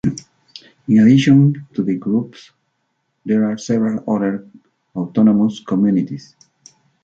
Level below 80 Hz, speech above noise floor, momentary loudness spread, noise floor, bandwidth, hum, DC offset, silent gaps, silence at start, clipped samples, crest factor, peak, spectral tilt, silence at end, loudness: -56 dBFS; 54 dB; 20 LU; -69 dBFS; 7.6 kHz; none; under 0.1%; none; 0.05 s; under 0.1%; 16 dB; -2 dBFS; -7.5 dB/octave; 0.85 s; -16 LUFS